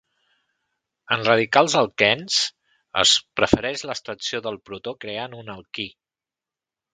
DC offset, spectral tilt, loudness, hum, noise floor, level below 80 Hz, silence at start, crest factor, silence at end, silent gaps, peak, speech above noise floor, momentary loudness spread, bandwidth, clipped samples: under 0.1%; -2.5 dB/octave; -21 LUFS; none; -90 dBFS; -52 dBFS; 1.1 s; 24 dB; 1.05 s; none; 0 dBFS; 68 dB; 16 LU; 9.6 kHz; under 0.1%